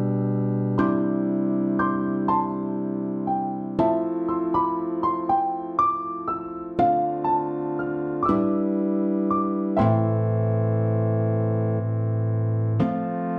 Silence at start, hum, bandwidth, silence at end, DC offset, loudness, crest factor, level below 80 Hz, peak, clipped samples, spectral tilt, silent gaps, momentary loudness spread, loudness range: 0 s; none; 4.4 kHz; 0 s; under 0.1%; -24 LUFS; 14 dB; -54 dBFS; -8 dBFS; under 0.1%; -11.5 dB/octave; none; 6 LU; 2 LU